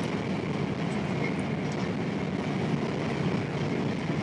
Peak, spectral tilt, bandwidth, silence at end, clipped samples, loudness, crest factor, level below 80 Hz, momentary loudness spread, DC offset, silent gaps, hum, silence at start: -16 dBFS; -7 dB/octave; 11 kHz; 0 s; under 0.1%; -30 LUFS; 14 dB; -58 dBFS; 2 LU; under 0.1%; none; none; 0 s